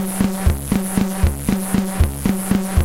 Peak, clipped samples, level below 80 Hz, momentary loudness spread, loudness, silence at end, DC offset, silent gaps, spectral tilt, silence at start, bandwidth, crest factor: -2 dBFS; under 0.1%; -24 dBFS; 2 LU; -20 LUFS; 0 s; under 0.1%; none; -6 dB/octave; 0 s; 17 kHz; 16 dB